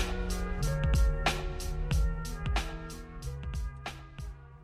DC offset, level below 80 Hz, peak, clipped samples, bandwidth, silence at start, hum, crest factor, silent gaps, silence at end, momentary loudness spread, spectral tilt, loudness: under 0.1%; -34 dBFS; -16 dBFS; under 0.1%; 15 kHz; 0 s; none; 16 dB; none; 0 s; 15 LU; -5 dB/octave; -34 LUFS